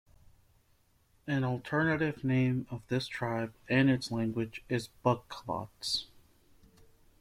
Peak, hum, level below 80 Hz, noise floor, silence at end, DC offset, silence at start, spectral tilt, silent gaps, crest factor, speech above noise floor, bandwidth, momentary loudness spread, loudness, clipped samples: -12 dBFS; none; -64 dBFS; -69 dBFS; 1.15 s; under 0.1%; 1.25 s; -6 dB/octave; none; 20 dB; 37 dB; 14.5 kHz; 9 LU; -32 LUFS; under 0.1%